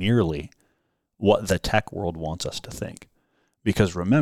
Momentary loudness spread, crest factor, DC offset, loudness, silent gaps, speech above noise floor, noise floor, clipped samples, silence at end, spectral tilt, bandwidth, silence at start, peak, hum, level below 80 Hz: 14 LU; 22 dB; under 0.1%; -25 LUFS; none; 49 dB; -72 dBFS; under 0.1%; 0 s; -6 dB/octave; 15.5 kHz; 0 s; -4 dBFS; none; -44 dBFS